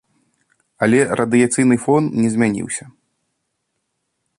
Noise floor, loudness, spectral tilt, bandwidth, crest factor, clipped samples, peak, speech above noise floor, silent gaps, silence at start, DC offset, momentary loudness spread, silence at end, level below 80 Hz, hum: -73 dBFS; -17 LUFS; -5.5 dB/octave; 11.5 kHz; 16 dB; under 0.1%; -2 dBFS; 57 dB; none; 0.8 s; under 0.1%; 9 LU; 1.5 s; -56 dBFS; none